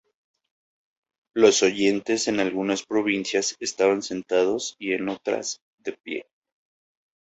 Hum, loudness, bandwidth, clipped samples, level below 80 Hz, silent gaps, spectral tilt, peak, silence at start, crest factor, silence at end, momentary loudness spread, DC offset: none; -24 LUFS; 8.2 kHz; under 0.1%; -68 dBFS; 5.62-5.78 s, 6.00-6.04 s; -3 dB/octave; -4 dBFS; 1.35 s; 22 dB; 1 s; 15 LU; under 0.1%